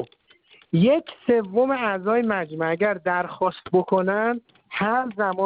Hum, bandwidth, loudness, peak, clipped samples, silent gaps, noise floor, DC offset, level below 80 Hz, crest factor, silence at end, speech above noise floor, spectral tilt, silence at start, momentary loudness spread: none; 5 kHz; -23 LUFS; -8 dBFS; under 0.1%; none; -56 dBFS; under 0.1%; -64 dBFS; 16 dB; 0 s; 34 dB; -11 dB/octave; 0 s; 6 LU